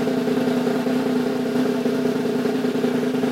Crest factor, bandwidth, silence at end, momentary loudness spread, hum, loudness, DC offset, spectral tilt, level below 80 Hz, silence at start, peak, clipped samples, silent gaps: 14 dB; 16 kHz; 0 s; 1 LU; none; -22 LUFS; under 0.1%; -6 dB/octave; -64 dBFS; 0 s; -8 dBFS; under 0.1%; none